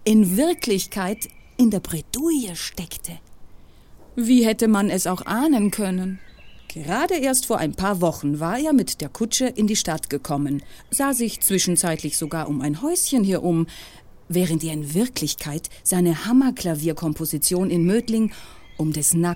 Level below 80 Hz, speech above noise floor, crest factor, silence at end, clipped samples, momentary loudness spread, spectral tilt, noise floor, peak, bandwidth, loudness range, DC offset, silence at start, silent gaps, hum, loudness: -48 dBFS; 24 dB; 16 dB; 0 s; under 0.1%; 10 LU; -4.5 dB/octave; -45 dBFS; -6 dBFS; 17 kHz; 2 LU; under 0.1%; 0 s; none; none; -22 LUFS